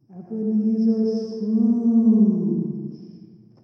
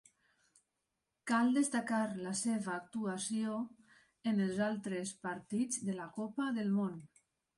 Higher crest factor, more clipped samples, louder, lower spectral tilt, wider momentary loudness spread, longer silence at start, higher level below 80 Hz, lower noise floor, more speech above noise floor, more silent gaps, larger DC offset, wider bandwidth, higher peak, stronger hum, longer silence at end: about the same, 14 dB vs 16 dB; neither; first, -21 LUFS vs -37 LUFS; first, -11 dB/octave vs -5 dB/octave; first, 16 LU vs 9 LU; second, 0.1 s vs 1.25 s; about the same, -76 dBFS vs -80 dBFS; second, -46 dBFS vs -87 dBFS; second, 27 dB vs 51 dB; neither; neither; second, 6 kHz vs 11.5 kHz; first, -8 dBFS vs -20 dBFS; neither; about the same, 0.45 s vs 0.5 s